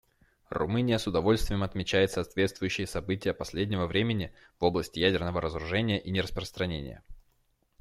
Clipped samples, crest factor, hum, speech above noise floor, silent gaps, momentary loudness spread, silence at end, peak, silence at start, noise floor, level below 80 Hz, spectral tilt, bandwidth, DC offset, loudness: under 0.1%; 20 dB; none; 42 dB; none; 7 LU; 0.6 s; -10 dBFS; 0.5 s; -71 dBFS; -46 dBFS; -5.5 dB/octave; 15 kHz; under 0.1%; -30 LUFS